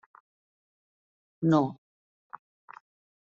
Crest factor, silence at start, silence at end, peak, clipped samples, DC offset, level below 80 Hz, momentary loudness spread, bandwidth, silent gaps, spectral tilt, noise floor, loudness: 22 dB; 1.4 s; 1.5 s; -12 dBFS; under 0.1%; under 0.1%; -76 dBFS; 25 LU; 7.2 kHz; none; -8 dB/octave; under -90 dBFS; -27 LUFS